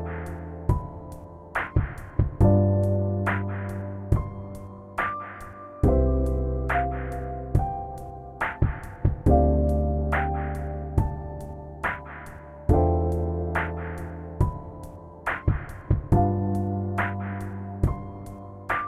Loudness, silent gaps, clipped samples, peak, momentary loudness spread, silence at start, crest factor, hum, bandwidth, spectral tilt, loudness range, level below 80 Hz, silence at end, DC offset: -27 LUFS; none; under 0.1%; -8 dBFS; 17 LU; 0 s; 18 dB; none; 12.5 kHz; -9 dB/octave; 3 LU; -32 dBFS; 0 s; under 0.1%